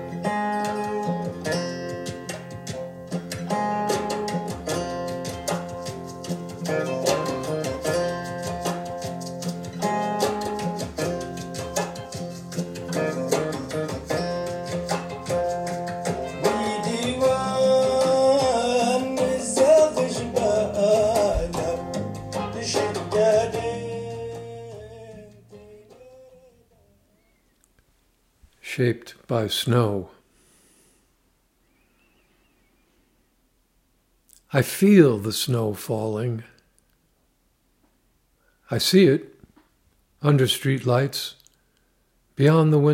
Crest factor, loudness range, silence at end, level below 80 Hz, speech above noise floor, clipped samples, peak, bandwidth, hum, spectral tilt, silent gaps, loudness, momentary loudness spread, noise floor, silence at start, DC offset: 22 dB; 9 LU; 0 s; -50 dBFS; 47 dB; under 0.1%; -2 dBFS; 16 kHz; none; -5.5 dB/octave; none; -24 LUFS; 14 LU; -66 dBFS; 0 s; under 0.1%